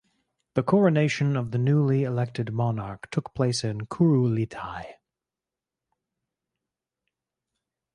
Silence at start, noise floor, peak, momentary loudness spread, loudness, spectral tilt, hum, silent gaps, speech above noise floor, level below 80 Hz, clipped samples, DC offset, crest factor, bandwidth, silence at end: 0.55 s; -89 dBFS; -8 dBFS; 11 LU; -25 LUFS; -7 dB/octave; none; none; 65 dB; -60 dBFS; under 0.1%; under 0.1%; 18 dB; 11 kHz; 3 s